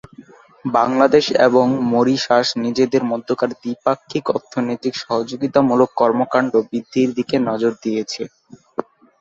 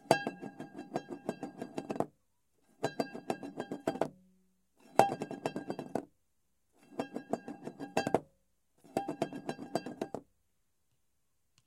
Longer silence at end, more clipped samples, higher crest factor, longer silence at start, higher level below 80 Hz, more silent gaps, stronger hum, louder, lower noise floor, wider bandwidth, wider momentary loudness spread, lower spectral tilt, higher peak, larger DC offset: second, 0.4 s vs 1.45 s; neither; second, 18 dB vs 34 dB; first, 0.2 s vs 0.05 s; first, -60 dBFS vs -76 dBFS; neither; neither; first, -18 LUFS vs -38 LUFS; second, -44 dBFS vs -82 dBFS; second, 7.6 kHz vs 16 kHz; second, 10 LU vs 13 LU; about the same, -5.5 dB/octave vs -5 dB/octave; first, 0 dBFS vs -6 dBFS; neither